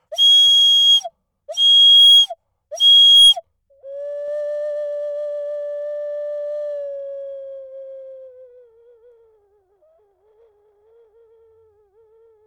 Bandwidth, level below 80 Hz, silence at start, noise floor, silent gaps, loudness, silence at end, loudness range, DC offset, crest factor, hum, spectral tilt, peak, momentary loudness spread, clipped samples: over 20 kHz; -68 dBFS; 0.1 s; -59 dBFS; none; -9 LUFS; 4.2 s; 21 LU; under 0.1%; 12 dB; none; 3.5 dB/octave; -6 dBFS; 24 LU; under 0.1%